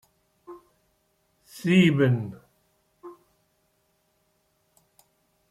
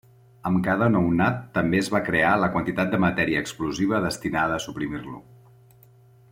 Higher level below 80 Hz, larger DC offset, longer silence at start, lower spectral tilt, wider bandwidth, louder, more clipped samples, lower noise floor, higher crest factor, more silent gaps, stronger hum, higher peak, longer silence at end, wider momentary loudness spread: second, -68 dBFS vs -52 dBFS; neither; about the same, 0.5 s vs 0.45 s; about the same, -7 dB/octave vs -6 dB/octave; second, 13.5 kHz vs 16 kHz; about the same, -22 LUFS vs -23 LUFS; neither; first, -70 dBFS vs -53 dBFS; about the same, 22 dB vs 18 dB; neither; neither; about the same, -6 dBFS vs -8 dBFS; first, 2.4 s vs 1.1 s; first, 29 LU vs 10 LU